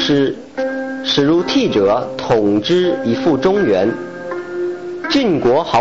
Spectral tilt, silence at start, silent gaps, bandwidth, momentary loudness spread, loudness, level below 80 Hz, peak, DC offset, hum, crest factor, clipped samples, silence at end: -5.5 dB/octave; 0 s; none; 7.8 kHz; 9 LU; -16 LUFS; -48 dBFS; -4 dBFS; 0.5%; none; 10 dB; under 0.1%; 0 s